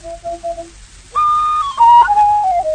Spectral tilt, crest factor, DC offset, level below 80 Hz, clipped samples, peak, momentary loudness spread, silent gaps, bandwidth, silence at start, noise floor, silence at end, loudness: -3 dB/octave; 12 dB; under 0.1%; -42 dBFS; under 0.1%; -2 dBFS; 18 LU; none; 9.6 kHz; 0.05 s; -38 dBFS; 0 s; -11 LUFS